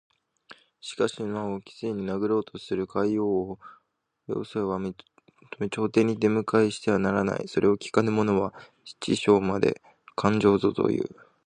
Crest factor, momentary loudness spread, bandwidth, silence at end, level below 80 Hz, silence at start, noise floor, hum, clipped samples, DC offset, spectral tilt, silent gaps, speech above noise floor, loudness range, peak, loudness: 22 dB; 14 LU; 10 kHz; 0.4 s; -58 dBFS; 0.5 s; -73 dBFS; none; under 0.1%; under 0.1%; -6.5 dB/octave; none; 48 dB; 5 LU; -4 dBFS; -26 LUFS